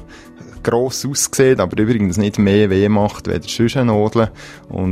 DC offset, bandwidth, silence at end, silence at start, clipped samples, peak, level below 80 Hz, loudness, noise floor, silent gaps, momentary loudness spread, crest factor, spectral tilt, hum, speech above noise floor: under 0.1%; 16 kHz; 0 s; 0 s; under 0.1%; -2 dBFS; -42 dBFS; -16 LUFS; -38 dBFS; none; 9 LU; 16 dB; -5.5 dB/octave; none; 23 dB